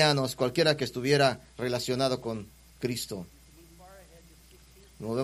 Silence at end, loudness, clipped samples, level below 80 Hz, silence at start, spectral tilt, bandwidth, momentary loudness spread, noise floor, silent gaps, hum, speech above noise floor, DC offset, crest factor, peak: 0 s; -28 LUFS; under 0.1%; -58 dBFS; 0 s; -4.5 dB/octave; 15.5 kHz; 16 LU; -55 dBFS; none; none; 27 dB; under 0.1%; 22 dB; -8 dBFS